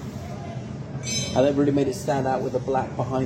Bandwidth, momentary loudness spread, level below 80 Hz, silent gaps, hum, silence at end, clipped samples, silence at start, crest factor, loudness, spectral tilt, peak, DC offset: 16 kHz; 13 LU; -50 dBFS; none; none; 0 s; under 0.1%; 0 s; 16 dB; -25 LUFS; -5.5 dB/octave; -8 dBFS; under 0.1%